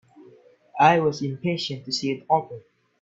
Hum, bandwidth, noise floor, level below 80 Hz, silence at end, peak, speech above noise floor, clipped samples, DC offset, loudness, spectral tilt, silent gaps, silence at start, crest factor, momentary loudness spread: none; 7.8 kHz; -53 dBFS; -64 dBFS; 0.45 s; -2 dBFS; 30 dB; under 0.1%; under 0.1%; -23 LUFS; -5 dB/octave; none; 0.75 s; 22 dB; 21 LU